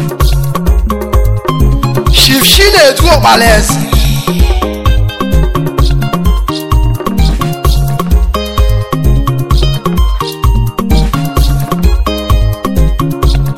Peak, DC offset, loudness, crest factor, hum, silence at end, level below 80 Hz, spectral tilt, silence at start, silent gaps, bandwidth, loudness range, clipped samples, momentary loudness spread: 0 dBFS; under 0.1%; -10 LUFS; 8 dB; none; 0 s; -12 dBFS; -4.5 dB/octave; 0 s; none; 16.5 kHz; 5 LU; 0.4%; 8 LU